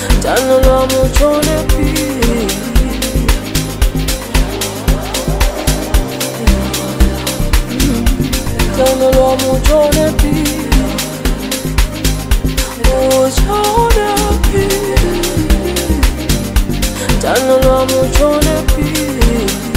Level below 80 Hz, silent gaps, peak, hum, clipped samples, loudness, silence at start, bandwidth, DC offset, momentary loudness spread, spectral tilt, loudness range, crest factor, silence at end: -16 dBFS; none; 0 dBFS; none; under 0.1%; -13 LUFS; 0 s; 16.5 kHz; 0.3%; 6 LU; -4.5 dB/octave; 3 LU; 12 dB; 0 s